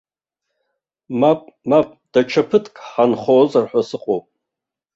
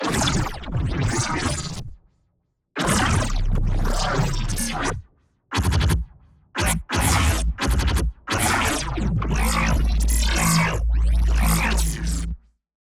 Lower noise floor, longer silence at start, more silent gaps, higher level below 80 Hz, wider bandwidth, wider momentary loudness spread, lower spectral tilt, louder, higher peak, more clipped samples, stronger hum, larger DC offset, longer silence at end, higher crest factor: first, -85 dBFS vs -70 dBFS; first, 1.1 s vs 0 s; neither; second, -62 dBFS vs -24 dBFS; second, 7.8 kHz vs 16.5 kHz; about the same, 9 LU vs 8 LU; first, -7 dB/octave vs -4 dB/octave; first, -18 LUFS vs -22 LUFS; first, -2 dBFS vs -6 dBFS; neither; neither; neither; first, 0.75 s vs 0.45 s; about the same, 18 dB vs 16 dB